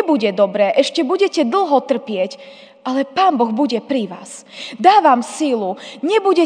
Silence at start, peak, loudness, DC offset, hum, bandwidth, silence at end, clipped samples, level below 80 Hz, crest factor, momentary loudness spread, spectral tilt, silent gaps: 0 s; 0 dBFS; -16 LUFS; under 0.1%; none; 10 kHz; 0 s; under 0.1%; -76 dBFS; 16 dB; 15 LU; -4.5 dB/octave; none